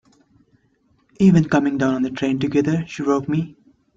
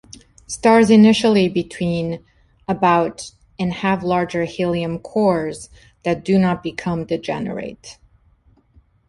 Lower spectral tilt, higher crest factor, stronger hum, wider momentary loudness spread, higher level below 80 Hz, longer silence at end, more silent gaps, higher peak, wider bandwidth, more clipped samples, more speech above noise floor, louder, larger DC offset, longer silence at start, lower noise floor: first, -7.5 dB/octave vs -6 dB/octave; about the same, 16 dB vs 16 dB; neither; second, 8 LU vs 19 LU; about the same, -54 dBFS vs -50 dBFS; second, 0.45 s vs 1.15 s; neither; about the same, -4 dBFS vs -2 dBFS; second, 7.6 kHz vs 11.5 kHz; neither; first, 44 dB vs 38 dB; about the same, -19 LUFS vs -18 LUFS; neither; first, 1.2 s vs 0.5 s; first, -62 dBFS vs -55 dBFS